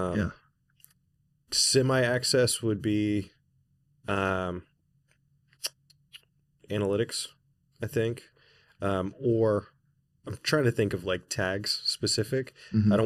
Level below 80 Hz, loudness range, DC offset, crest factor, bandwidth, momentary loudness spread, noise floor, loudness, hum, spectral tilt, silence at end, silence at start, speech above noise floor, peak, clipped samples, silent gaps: -58 dBFS; 8 LU; under 0.1%; 18 dB; 14.5 kHz; 13 LU; -71 dBFS; -28 LUFS; none; -4.5 dB/octave; 0 s; 0 s; 44 dB; -10 dBFS; under 0.1%; none